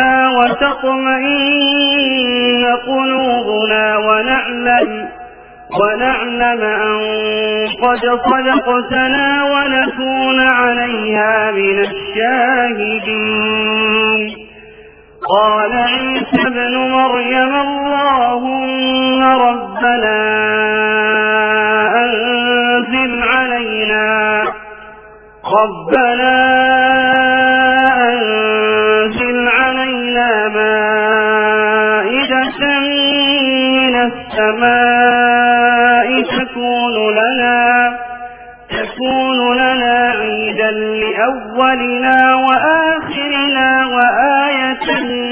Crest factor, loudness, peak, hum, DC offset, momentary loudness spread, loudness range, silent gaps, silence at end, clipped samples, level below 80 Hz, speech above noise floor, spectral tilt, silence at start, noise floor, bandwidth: 12 dB; -12 LUFS; 0 dBFS; none; under 0.1%; 6 LU; 3 LU; none; 0 s; under 0.1%; -46 dBFS; 26 dB; -7 dB/octave; 0 s; -39 dBFS; 5.2 kHz